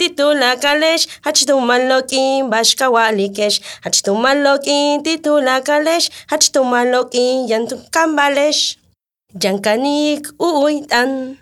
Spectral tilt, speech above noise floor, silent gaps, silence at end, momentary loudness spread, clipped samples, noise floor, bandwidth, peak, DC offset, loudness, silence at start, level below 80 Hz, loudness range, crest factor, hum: -1.5 dB/octave; 46 dB; none; 0.05 s; 5 LU; under 0.1%; -61 dBFS; 16 kHz; 0 dBFS; under 0.1%; -14 LUFS; 0 s; -64 dBFS; 3 LU; 14 dB; none